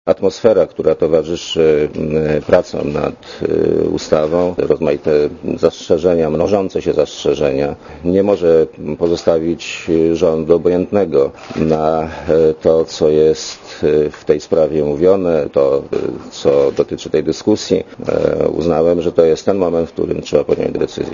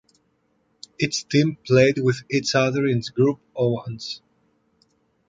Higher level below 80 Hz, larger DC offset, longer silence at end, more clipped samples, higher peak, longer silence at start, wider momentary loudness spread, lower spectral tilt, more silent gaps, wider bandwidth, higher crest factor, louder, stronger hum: first, -42 dBFS vs -58 dBFS; neither; second, 0 s vs 1.1 s; neither; about the same, 0 dBFS vs -2 dBFS; second, 0.05 s vs 1 s; second, 7 LU vs 13 LU; about the same, -6 dB/octave vs -5.5 dB/octave; neither; second, 7.4 kHz vs 9.2 kHz; second, 14 dB vs 20 dB; first, -15 LUFS vs -22 LUFS; neither